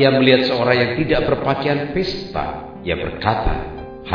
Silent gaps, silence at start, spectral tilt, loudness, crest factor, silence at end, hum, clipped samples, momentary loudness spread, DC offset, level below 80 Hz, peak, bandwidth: none; 0 s; -7.5 dB/octave; -19 LUFS; 18 dB; 0 s; none; under 0.1%; 14 LU; 0.2%; -32 dBFS; 0 dBFS; 5.4 kHz